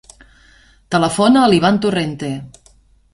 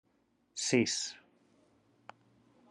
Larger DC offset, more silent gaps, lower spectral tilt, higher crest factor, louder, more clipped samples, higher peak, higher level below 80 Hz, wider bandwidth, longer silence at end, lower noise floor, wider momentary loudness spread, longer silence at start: neither; neither; first, -5.5 dB/octave vs -3 dB/octave; second, 16 dB vs 24 dB; first, -15 LUFS vs -33 LUFS; neither; first, -2 dBFS vs -14 dBFS; first, -48 dBFS vs -82 dBFS; about the same, 11.5 kHz vs 11.5 kHz; second, 0.65 s vs 1.55 s; second, -51 dBFS vs -74 dBFS; second, 14 LU vs 18 LU; first, 0.9 s vs 0.55 s